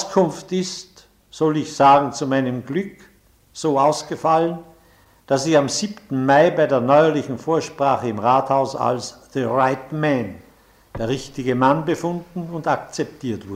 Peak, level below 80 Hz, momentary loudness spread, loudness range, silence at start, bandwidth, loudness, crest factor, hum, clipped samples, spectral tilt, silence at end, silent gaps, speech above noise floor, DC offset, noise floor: -4 dBFS; -54 dBFS; 13 LU; 5 LU; 0 s; 15.5 kHz; -20 LUFS; 16 dB; none; under 0.1%; -5.5 dB/octave; 0 s; none; 34 dB; under 0.1%; -53 dBFS